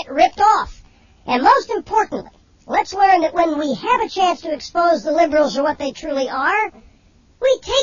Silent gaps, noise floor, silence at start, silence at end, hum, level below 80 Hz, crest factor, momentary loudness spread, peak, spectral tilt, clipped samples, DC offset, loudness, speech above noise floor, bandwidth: none; -52 dBFS; 0 s; 0 s; none; -48 dBFS; 18 dB; 10 LU; 0 dBFS; -3.5 dB/octave; under 0.1%; under 0.1%; -17 LUFS; 35 dB; 7.4 kHz